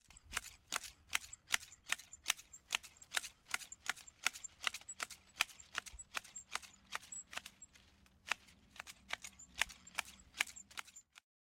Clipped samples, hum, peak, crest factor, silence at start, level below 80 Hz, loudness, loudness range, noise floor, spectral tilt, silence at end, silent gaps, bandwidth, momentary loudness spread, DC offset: under 0.1%; none; -16 dBFS; 30 dB; 0.1 s; -70 dBFS; -43 LUFS; 6 LU; -68 dBFS; 1.5 dB/octave; 0.35 s; none; 16.5 kHz; 12 LU; under 0.1%